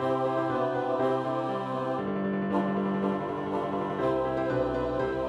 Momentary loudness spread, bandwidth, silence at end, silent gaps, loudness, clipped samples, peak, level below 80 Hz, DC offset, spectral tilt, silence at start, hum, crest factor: 3 LU; 10.5 kHz; 0 s; none; -29 LUFS; under 0.1%; -14 dBFS; -54 dBFS; under 0.1%; -8 dB/octave; 0 s; none; 14 dB